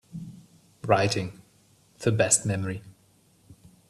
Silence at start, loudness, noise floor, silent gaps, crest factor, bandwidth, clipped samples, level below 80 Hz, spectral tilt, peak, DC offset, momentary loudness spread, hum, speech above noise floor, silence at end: 0.15 s; -25 LUFS; -62 dBFS; none; 22 dB; 14 kHz; under 0.1%; -62 dBFS; -4 dB/octave; -6 dBFS; under 0.1%; 20 LU; none; 37 dB; 0.35 s